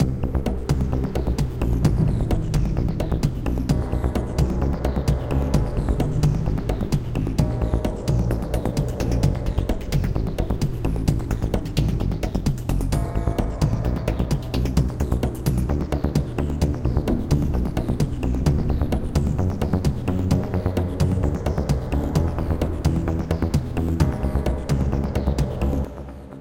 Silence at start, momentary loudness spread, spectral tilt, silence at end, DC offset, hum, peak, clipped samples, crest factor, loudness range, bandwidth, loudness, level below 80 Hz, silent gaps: 0 s; 3 LU; -7.5 dB/octave; 0 s; 0.2%; none; -4 dBFS; under 0.1%; 18 dB; 1 LU; 16.5 kHz; -24 LUFS; -26 dBFS; none